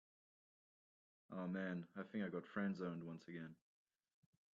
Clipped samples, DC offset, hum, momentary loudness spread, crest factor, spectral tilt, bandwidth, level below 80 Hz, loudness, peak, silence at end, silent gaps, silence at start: under 0.1%; under 0.1%; none; 10 LU; 18 dB; -6.5 dB/octave; 7.4 kHz; -88 dBFS; -48 LUFS; -30 dBFS; 1 s; none; 1.3 s